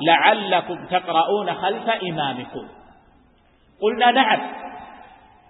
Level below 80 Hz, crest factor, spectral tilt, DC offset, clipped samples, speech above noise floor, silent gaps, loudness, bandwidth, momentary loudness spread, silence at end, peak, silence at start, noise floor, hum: -62 dBFS; 22 dB; -9 dB/octave; under 0.1%; under 0.1%; 36 dB; none; -20 LUFS; 4.1 kHz; 19 LU; 0.45 s; 0 dBFS; 0 s; -56 dBFS; none